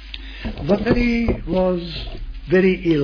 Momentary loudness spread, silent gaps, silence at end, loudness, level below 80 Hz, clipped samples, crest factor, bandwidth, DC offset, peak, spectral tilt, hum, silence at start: 15 LU; none; 0 s; -19 LUFS; -30 dBFS; under 0.1%; 16 dB; 5.4 kHz; under 0.1%; -4 dBFS; -8 dB/octave; none; 0 s